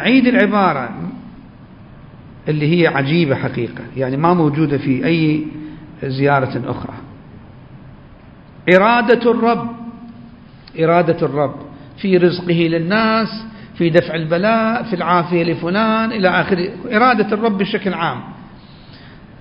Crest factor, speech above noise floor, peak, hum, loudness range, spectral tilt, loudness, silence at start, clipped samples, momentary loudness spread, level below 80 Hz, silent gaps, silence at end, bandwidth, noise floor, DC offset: 16 dB; 26 dB; 0 dBFS; none; 4 LU; -9 dB/octave; -16 LUFS; 0 s; under 0.1%; 17 LU; -48 dBFS; none; 0.25 s; 5.4 kHz; -41 dBFS; under 0.1%